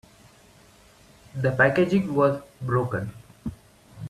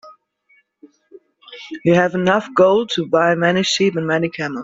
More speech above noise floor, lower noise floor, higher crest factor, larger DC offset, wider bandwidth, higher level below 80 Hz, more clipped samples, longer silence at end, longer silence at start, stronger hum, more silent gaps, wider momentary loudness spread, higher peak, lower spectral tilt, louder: second, 31 dB vs 43 dB; second, -54 dBFS vs -59 dBFS; about the same, 20 dB vs 16 dB; neither; first, 13.5 kHz vs 7.8 kHz; first, -54 dBFS vs -60 dBFS; neither; about the same, 0 s vs 0 s; first, 1.35 s vs 0.05 s; neither; neither; first, 18 LU vs 8 LU; second, -6 dBFS vs -2 dBFS; first, -7.5 dB/octave vs -5 dB/octave; second, -23 LUFS vs -16 LUFS